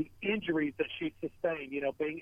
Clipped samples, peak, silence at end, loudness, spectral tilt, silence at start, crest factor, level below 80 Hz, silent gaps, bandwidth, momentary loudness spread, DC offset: under 0.1%; -18 dBFS; 0 s; -34 LUFS; -7.5 dB/octave; 0 s; 16 dB; -68 dBFS; none; 5.2 kHz; 5 LU; under 0.1%